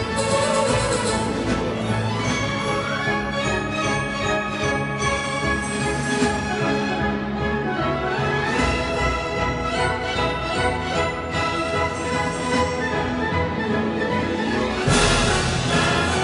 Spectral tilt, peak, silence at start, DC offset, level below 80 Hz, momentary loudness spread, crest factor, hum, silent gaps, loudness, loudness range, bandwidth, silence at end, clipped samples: -4.5 dB/octave; -4 dBFS; 0 s; under 0.1%; -36 dBFS; 4 LU; 18 dB; none; none; -22 LUFS; 2 LU; 11 kHz; 0 s; under 0.1%